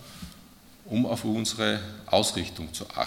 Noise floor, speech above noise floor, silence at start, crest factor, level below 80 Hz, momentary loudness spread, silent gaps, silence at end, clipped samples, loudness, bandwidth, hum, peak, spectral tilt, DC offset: -52 dBFS; 24 dB; 0 s; 24 dB; -56 dBFS; 17 LU; none; 0 s; under 0.1%; -28 LUFS; 17 kHz; none; -6 dBFS; -4 dB/octave; under 0.1%